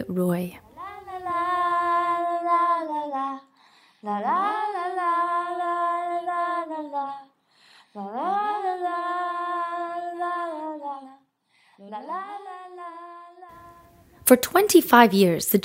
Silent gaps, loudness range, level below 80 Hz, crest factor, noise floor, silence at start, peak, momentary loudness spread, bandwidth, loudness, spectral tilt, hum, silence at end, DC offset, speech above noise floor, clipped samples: none; 11 LU; -66 dBFS; 24 dB; -64 dBFS; 0 s; 0 dBFS; 21 LU; 16 kHz; -24 LUFS; -4.5 dB/octave; none; 0 s; under 0.1%; 44 dB; under 0.1%